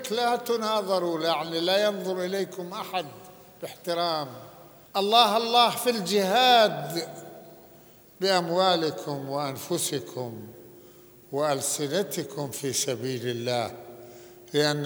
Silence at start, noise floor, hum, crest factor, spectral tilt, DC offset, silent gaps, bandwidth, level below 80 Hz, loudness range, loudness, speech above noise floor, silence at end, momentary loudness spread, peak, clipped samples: 0 s; -53 dBFS; none; 22 dB; -3 dB/octave; under 0.1%; none; over 20 kHz; -72 dBFS; 7 LU; -26 LUFS; 27 dB; 0 s; 18 LU; -4 dBFS; under 0.1%